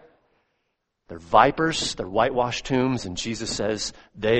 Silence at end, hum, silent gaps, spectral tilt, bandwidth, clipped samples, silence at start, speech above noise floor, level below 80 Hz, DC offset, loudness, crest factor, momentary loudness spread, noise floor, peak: 0 s; none; none; -4 dB/octave; 8.8 kHz; under 0.1%; 1.1 s; 53 dB; -48 dBFS; under 0.1%; -23 LUFS; 22 dB; 11 LU; -76 dBFS; -2 dBFS